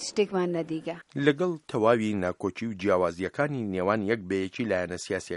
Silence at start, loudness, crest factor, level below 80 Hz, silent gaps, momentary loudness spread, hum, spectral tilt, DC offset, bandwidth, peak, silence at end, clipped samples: 0 s; -28 LUFS; 22 dB; -64 dBFS; none; 8 LU; none; -5.5 dB/octave; under 0.1%; 11.5 kHz; -6 dBFS; 0 s; under 0.1%